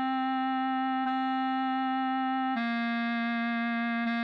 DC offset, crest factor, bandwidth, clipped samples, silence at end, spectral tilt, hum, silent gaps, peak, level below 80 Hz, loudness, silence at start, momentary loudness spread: under 0.1%; 8 dB; 5.6 kHz; under 0.1%; 0 s; -6 dB/octave; none; none; -20 dBFS; -88 dBFS; -30 LUFS; 0 s; 0 LU